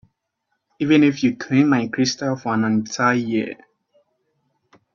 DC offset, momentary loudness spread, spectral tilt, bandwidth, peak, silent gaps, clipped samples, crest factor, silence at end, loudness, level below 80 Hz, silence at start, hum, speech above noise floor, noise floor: under 0.1%; 9 LU; -5.5 dB/octave; 7.4 kHz; -4 dBFS; none; under 0.1%; 18 dB; 1.4 s; -19 LUFS; -62 dBFS; 0.8 s; none; 56 dB; -75 dBFS